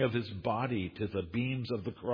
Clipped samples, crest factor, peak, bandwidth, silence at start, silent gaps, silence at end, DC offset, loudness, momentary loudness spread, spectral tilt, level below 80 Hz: under 0.1%; 16 dB; -18 dBFS; 5.2 kHz; 0 s; none; 0 s; under 0.1%; -35 LUFS; 4 LU; -9 dB/octave; -60 dBFS